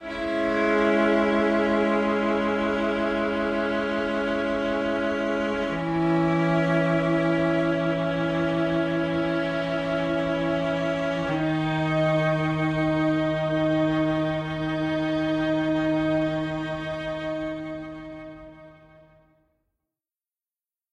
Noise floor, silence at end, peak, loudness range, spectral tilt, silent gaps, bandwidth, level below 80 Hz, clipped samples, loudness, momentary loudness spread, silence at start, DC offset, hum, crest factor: under -90 dBFS; 2.2 s; -10 dBFS; 7 LU; -7 dB/octave; none; 9.4 kHz; -50 dBFS; under 0.1%; -24 LUFS; 7 LU; 0 s; under 0.1%; none; 14 dB